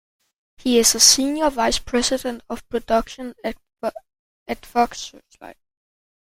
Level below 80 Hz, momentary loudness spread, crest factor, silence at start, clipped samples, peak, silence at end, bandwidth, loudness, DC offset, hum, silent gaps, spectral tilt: -44 dBFS; 20 LU; 22 dB; 0.65 s; under 0.1%; 0 dBFS; 0.75 s; 16.5 kHz; -19 LUFS; under 0.1%; none; 4.19-4.46 s; -1 dB/octave